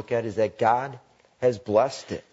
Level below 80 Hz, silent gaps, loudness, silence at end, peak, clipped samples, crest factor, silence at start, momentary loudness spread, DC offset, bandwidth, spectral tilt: -64 dBFS; none; -25 LUFS; 0.1 s; -8 dBFS; under 0.1%; 18 dB; 0 s; 8 LU; under 0.1%; 8 kHz; -6 dB/octave